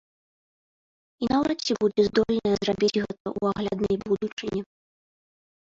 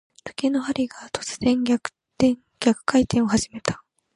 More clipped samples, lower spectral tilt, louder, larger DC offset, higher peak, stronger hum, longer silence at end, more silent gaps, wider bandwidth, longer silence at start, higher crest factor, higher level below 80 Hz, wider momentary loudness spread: neither; about the same, -5.5 dB/octave vs -4.5 dB/octave; second, -26 LUFS vs -23 LUFS; neither; second, -10 dBFS vs -4 dBFS; neither; first, 0.95 s vs 0.4 s; first, 3.20-3.25 s, 4.32-4.37 s vs none; second, 7.6 kHz vs 11.5 kHz; first, 1.2 s vs 0.25 s; about the same, 18 dB vs 18 dB; about the same, -54 dBFS vs -50 dBFS; about the same, 9 LU vs 10 LU